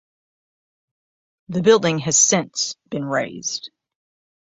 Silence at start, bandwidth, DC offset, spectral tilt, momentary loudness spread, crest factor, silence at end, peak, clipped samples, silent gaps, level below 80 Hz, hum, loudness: 1.5 s; 8 kHz; under 0.1%; -3 dB/octave; 13 LU; 20 dB; 0.8 s; -2 dBFS; under 0.1%; none; -62 dBFS; none; -19 LUFS